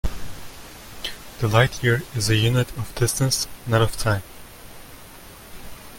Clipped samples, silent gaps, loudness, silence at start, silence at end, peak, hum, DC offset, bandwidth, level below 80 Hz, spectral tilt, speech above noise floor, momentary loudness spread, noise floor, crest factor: under 0.1%; none; -22 LUFS; 0.05 s; 0 s; -2 dBFS; none; under 0.1%; 17 kHz; -38 dBFS; -4.5 dB/octave; 22 dB; 23 LU; -42 dBFS; 20 dB